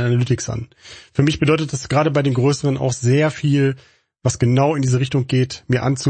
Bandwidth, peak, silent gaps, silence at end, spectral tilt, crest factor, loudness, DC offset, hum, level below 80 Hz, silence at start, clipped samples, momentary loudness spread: 8.8 kHz; -2 dBFS; none; 0 s; -6 dB/octave; 16 dB; -18 LUFS; under 0.1%; none; -48 dBFS; 0 s; under 0.1%; 7 LU